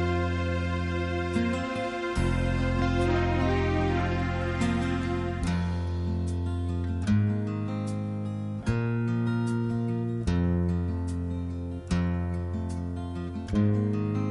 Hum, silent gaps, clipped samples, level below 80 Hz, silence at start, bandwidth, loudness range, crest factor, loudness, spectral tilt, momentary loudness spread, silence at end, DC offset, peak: none; none; under 0.1%; -38 dBFS; 0 s; 11 kHz; 3 LU; 14 dB; -29 LUFS; -7.5 dB/octave; 7 LU; 0 s; under 0.1%; -12 dBFS